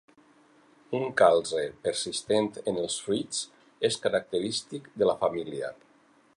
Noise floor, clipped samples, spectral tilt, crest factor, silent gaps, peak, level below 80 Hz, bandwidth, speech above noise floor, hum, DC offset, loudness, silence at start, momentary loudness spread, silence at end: -62 dBFS; under 0.1%; -3.5 dB/octave; 22 dB; none; -8 dBFS; -68 dBFS; 11.5 kHz; 34 dB; none; under 0.1%; -28 LUFS; 0.9 s; 13 LU; 0.65 s